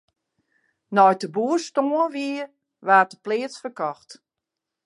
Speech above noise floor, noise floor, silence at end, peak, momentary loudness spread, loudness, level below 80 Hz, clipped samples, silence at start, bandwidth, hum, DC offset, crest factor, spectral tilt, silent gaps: 63 dB; -85 dBFS; 0.75 s; -4 dBFS; 15 LU; -22 LUFS; -82 dBFS; under 0.1%; 0.9 s; 11.5 kHz; none; under 0.1%; 20 dB; -5 dB/octave; none